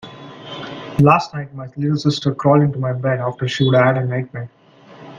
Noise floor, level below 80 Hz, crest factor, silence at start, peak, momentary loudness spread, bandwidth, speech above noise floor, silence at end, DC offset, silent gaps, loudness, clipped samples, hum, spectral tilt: -42 dBFS; -52 dBFS; 18 dB; 0.05 s; 0 dBFS; 18 LU; 7.4 kHz; 25 dB; 0 s; under 0.1%; none; -17 LUFS; under 0.1%; none; -7 dB/octave